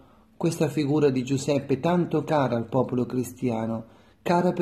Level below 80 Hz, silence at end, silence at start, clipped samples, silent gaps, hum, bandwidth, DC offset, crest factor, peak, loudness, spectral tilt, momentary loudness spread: -60 dBFS; 0 s; 0.4 s; under 0.1%; none; none; 13.5 kHz; under 0.1%; 16 dB; -8 dBFS; -25 LUFS; -7 dB/octave; 7 LU